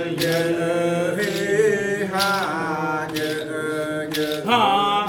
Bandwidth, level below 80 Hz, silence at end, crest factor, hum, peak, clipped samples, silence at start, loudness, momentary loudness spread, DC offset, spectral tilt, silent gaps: 19 kHz; -58 dBFS; 0 s; 16 dB; none; -6 dBFS; under 0.1%; 0 s; -21 LUFS; 7 LU; under 0.1%; -4.5 dB/octave; none